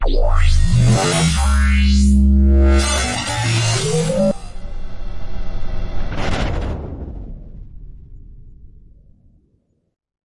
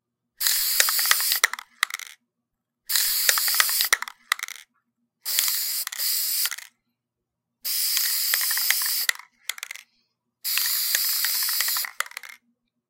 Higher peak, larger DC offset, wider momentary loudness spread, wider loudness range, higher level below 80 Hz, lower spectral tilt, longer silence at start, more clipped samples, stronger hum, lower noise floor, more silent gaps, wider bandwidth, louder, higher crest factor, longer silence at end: second, -4 dBFS vs 0 dBFS; neither; first, 21 LU vs 15 LU; first, 14 LU vs 3 LU; first, -18 dBFS vs -70 dBFS; first, -5 dB/octave vs 5.5 dB/octave; second, 0 s vs 0.4 s; neither; neither; second, -62 dBFS vs -83 dBFS; neither; second, 11.5 kHz vs 17 kHz; first, -17 LUFS vs -22 LUFS; second, 12 dB vs 26 dB; first, 1.6 s vs 0.55 s